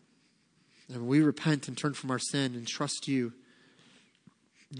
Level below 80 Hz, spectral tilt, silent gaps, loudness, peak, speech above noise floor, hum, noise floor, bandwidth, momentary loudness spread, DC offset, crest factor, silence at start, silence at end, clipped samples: -82 dBFS; -5 dB/octave; none; -31 LUFS; -14 dBFS; 38 dB; none; -68 dBFS; 10.5 kHz; 10 LU; under 0.1%; 18 dB; 0.9 s; 0 s; under 0.1%